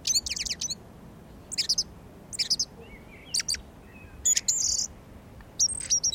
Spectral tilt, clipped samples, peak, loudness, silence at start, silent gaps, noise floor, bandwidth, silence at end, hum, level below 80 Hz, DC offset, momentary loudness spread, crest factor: 0.5 dB/octave; under 0.1%; -10 dBFS; -26 LUFS; 0 s; none; -48 dBFS; 16.5 kHz; 0 s; none; -52 dBFS; under 0.1%; 17 LU; 22 dB